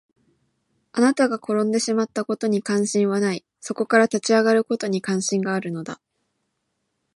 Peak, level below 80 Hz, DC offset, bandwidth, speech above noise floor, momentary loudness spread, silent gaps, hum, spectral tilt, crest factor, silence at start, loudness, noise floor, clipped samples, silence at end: -4 dBFS; -74 dBFS; under 0.1%; 11.5 kHz; 54 dB; 12 LU; none; none; -4.5 dB/octave; 20 dB; 0.95 s; -22 LUFS; -75 dBFS; under 0.1%; 1.2 s